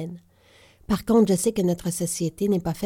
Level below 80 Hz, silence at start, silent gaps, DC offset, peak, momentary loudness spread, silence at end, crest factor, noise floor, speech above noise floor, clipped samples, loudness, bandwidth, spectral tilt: -50 dBFS; 0 s; none; under 0.1%; -8 dBFS; 8 LU; 0 s; 16 dB; -55 dBFS; 32 dB; under 0.1%; -23 LUFS; 17 kHz; -6 dB/octave